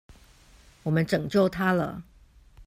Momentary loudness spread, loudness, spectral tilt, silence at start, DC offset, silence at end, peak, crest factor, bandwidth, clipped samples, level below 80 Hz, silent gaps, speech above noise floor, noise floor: 12 LU; -26 LUFS; -7 dB/octave; 0.1 s; under 0.1%; 0.05 s; -10 dBFS; 18 dB; 16 kHz; under 0.1%; -54 dBFS; none; 30 dB; -55 dBFS